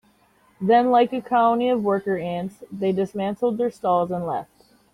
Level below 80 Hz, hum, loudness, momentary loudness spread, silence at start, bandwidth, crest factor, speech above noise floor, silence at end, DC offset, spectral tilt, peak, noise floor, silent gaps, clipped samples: -62 dBFS; none; -22 LUFS; 10 LU; 0.6 s; 13 kHz; 18 dB; 38 dB; 0.5 s; under 0.1%; -7.5 dB/octave; -6 dBFS; -59 dBFS; none; under 0.1%